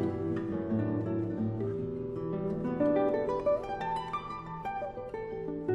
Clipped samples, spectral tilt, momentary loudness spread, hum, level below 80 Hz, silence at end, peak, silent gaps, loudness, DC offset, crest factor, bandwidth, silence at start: under 0.1%; -9 dB/octave; 9 LU; none; -56 dBFS; 0 s; -16 dBFS; none; -33 LUFS; under 0.1%; 16 dB; 10.5 kHz; 0 s